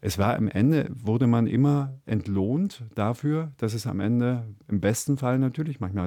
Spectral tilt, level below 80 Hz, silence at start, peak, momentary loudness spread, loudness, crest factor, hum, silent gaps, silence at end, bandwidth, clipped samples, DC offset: -7 dB/octave; -58 dBFS; 0.05 s; -10 dBFS; 8 LU; -25 LUFS; 16 dB; none; none; 0 s; 18.5 kHz; under 0.1%; under 0.1%